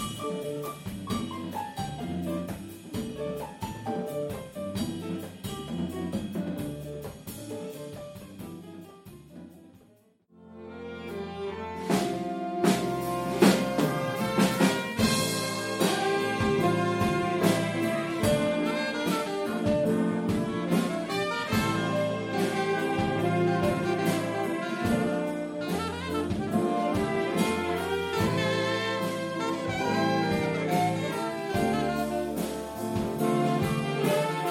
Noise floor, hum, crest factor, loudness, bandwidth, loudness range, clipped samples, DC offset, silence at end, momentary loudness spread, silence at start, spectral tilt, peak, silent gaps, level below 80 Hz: -61 dBFS; none; 24 dB; -28 LUFS; 16.5 kHz; 10 LU; under 0.1%; under 0.1%; 0 s; 12 LU; 0 s; -5.5 dB/octave; -6 dBFS; none; -54 dBFS